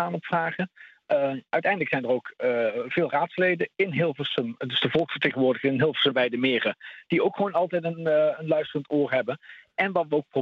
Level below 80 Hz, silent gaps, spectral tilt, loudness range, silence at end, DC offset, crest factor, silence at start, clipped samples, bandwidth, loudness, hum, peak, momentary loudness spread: -70 dBFS; none; -7.5 dB/octave; 2 LU; 0 s; under 0.1%; 16 dB; 0 s; under 0.1%; 7 kHz; -25 LUFS; none; -10 dBFS; 5 LU